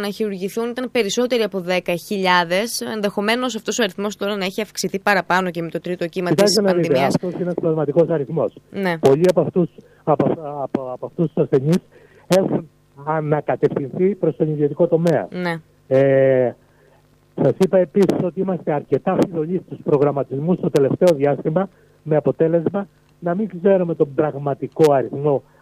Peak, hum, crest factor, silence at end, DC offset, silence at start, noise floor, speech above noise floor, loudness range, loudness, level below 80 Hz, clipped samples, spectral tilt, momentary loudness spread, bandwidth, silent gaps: 0 dBFS; none; 18 dB; 0.2 s; under 0.1%; 0 s; -54 dBFS; 35 dB; 2 LU; -19 LUFS; -60 dBFS; under 0.1%; -6 dB/octave; 9 LU; 15.5 kHz; none